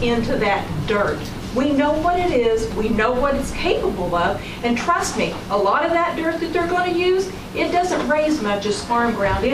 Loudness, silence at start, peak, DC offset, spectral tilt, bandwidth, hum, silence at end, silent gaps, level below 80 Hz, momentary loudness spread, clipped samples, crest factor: -20 LUFS; 0 s; -6 dBFS; under 0.1%; -5 dB/octave; 15.5 kHz; none; 0 s; none; -36 dBFS; 4 LU; under 0.1%; 14 dB